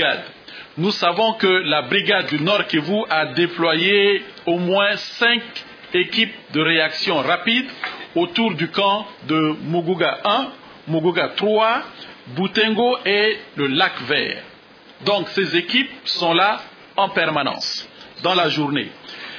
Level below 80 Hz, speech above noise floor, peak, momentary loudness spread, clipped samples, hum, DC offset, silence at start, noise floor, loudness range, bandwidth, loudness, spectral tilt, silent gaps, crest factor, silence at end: -70 dBFS; 26 dB; -2 dBFS; 10 LU; under 0.1%; none; under 0.1%; 0 s; -45 dBFS; 2 LU; 5.4 kHz; -19 LUFS; -5 dB/octave; none; 18 dB; 0 s